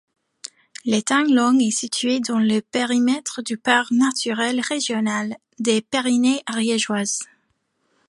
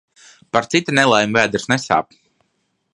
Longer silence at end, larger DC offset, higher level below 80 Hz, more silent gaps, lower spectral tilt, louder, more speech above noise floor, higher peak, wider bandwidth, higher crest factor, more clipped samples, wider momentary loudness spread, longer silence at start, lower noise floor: about the same, 0.85 s vs 0.9 s; neither; second, -72 dBFS vs -56 dBFS; neither; about the same, -3 dB/octave vs -4 dB/octave; second, -20 LUFS vs -17 LUFS; about the same, 49 dB vs 52 dB; about the same, -2 dBFS vs 0 dBFS; about the same, 11.5 kHz vs 11.5 kHz; about the same, 20 dB vs 20 dB; neither; first, 10 LU vs 7 LU; about the same, 0.45 s vs 0.55 s; about the same, -69 dBFS vs -69 dBFS